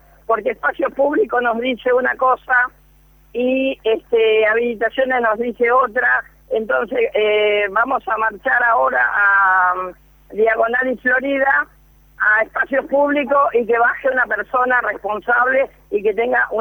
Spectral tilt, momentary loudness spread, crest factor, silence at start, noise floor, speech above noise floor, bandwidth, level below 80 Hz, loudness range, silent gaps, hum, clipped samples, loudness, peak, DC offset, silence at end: -5.5 dB/octave; 6 LU; 12 dB; 0.3 s; -50 dBFS; 33 dB; 19 kHz; -52 dBFS; 2 LU; none; none; under 0.1%; -17 LUFS; -4 dBFS; under 0.1%; 0 s